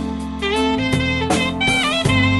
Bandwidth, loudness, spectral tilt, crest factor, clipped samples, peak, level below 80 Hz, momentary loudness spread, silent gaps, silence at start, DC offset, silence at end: 12 kHz; -18 LUFS; -4.5 dB/octave; 14 dB; under 0.1%; -4 dBFS; -34 dBFS; 6 LU; none; 0 s; under 0.1%; 0 s